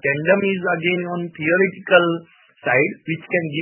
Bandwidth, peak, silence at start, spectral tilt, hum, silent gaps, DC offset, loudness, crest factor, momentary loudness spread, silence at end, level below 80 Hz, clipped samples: 3.2 kHz; 0 dBFS; 0.05 s; -11 dB/octave; none; none; under 0.1%; -19 LUFS; 20 dB; 11 LU; 0 s; -66 dBFS; under 0.1%